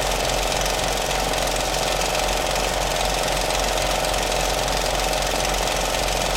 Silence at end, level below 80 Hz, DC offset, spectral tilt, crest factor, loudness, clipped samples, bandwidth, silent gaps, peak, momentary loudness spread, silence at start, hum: 0 s; -30 dBFS; under 0.1%; -2 dB/octave; 16 dB; -21 LUFS; under 0.1%; 17 kHz; none; -4 dBFS; 1 LU; 0 s; none